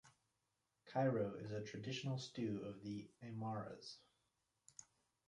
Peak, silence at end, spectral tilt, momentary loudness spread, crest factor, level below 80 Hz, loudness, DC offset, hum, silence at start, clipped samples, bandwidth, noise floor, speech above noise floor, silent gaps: -28 dBFS; 0.45 s; -6 dB/octave; 21 LU; 20 dB; -80 dBFS; -45 LUFS; under 0.1%; none; 0.05 s; under 0.1%; 11 kHz; -88 dBFS; 43 dB; none